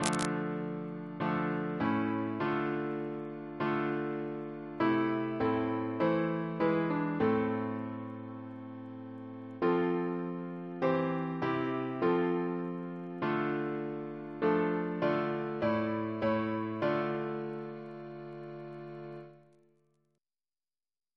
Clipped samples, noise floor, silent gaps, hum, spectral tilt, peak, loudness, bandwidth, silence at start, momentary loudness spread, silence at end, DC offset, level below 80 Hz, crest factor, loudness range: under 0.1%; under -90 dBFS; none; none; -6.5 dB/octave; -8 dBFS; -33 LUFS; 11 kHz; 0 s; 15 LU; 1.75 s; under 0.1%; -70 dBFS; 26 dB; 5 LU